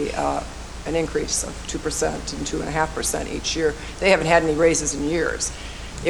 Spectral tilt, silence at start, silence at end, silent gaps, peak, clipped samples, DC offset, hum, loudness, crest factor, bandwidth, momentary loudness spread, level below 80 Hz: -3.5 dB/octave; 0 s; 0 s; none; -2 dBFS; under 0.1%; under 0.1%; none; -22 LUFS; 20 dB; 19 kHz; 11 LU; -36 dBFS